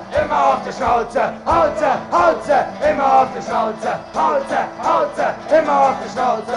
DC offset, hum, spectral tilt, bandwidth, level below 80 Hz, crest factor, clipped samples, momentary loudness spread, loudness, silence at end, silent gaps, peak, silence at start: under 0.1%; none; -5 dB/octave; 11.5 kHz; -44 dBFS; 14 dB; under 0.1%; 6 LU; -17 LUFS; 0 s; none; -2 dBFS; 0 s